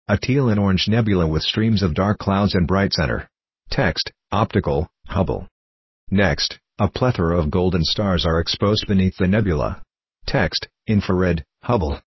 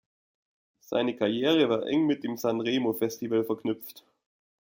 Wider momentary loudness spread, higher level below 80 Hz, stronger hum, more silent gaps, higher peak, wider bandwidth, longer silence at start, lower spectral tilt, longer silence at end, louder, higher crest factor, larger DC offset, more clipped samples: about the same, 6 LU vs 8 LU; first, -32 dBFS vs -72 dBFS; neither; first, 5.51-6.07 s vs none; first, -2 dBFS vs -12 dBFS; second, 6.2 kHz vs 17 kHz; second, 0.1 s vs 0.9 s; about the same, -6.5 dB/octave vs -5.5 dB/octave; second, 0.1 s vs 0.65 s; first, -20 LUFS vs -28 LUFS; about the same, 18 dB vs 18 dB; neither; neither